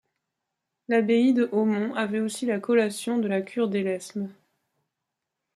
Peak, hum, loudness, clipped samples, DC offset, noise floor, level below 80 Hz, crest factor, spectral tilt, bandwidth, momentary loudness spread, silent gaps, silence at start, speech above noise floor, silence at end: -10 dBFS; none; -25 LUFS; under 0.1%; under 0.1%; -84 dBFS; -76 dBFS; 16 dB; -5.5 dB/octave; 13 kHz; 9 LU; none; 0.9 s; 60 dB; 1.25 s